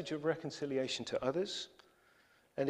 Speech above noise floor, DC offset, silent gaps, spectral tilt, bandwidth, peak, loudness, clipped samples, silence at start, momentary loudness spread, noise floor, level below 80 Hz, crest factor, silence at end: 31 dB; under 0.1%; none; -4.5 dB/octave; 12 kHz; -20 dBFS; -38 LUFS; under 0.1%; 0 s; 8 LU; -69 dBFS; -74 dBFS; 20 dB; 0 s